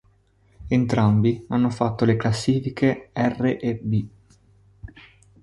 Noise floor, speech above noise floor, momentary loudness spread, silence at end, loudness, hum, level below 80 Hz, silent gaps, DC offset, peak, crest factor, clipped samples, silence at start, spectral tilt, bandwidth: -59 dBFS; 38 dB; 7 LU; 0.4 s; -22 LUFS; none; -48 dBFS; none; under 0.1%; -6 dBFS; 18 dB; under 0.1%; 0.6 s; -7.5 dB/octave; 11.5 kHz